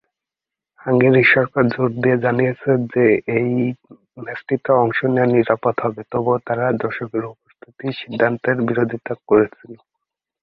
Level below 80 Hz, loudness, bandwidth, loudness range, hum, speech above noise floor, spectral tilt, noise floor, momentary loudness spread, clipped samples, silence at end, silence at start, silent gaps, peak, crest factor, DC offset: -58 dBFS; -18 LUFS; 5.4 kHz; 5 LU; none; 69 dB; -10 dB/octave; -87 dBFS; 13 LU; under 0.1%; 0.65 s; 0.85 s; none; 0 dBFS; 18 dB; under 0.1%